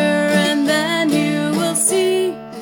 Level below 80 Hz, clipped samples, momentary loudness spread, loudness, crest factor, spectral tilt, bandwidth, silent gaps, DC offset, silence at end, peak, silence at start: -66 dBFS; under 0.1%; 3 LU; -17 LUFS; 12 dB; -3.5 dB/octave; 17 kHz; none; under 0.1%; 0 s; -4 dBFS; 0 s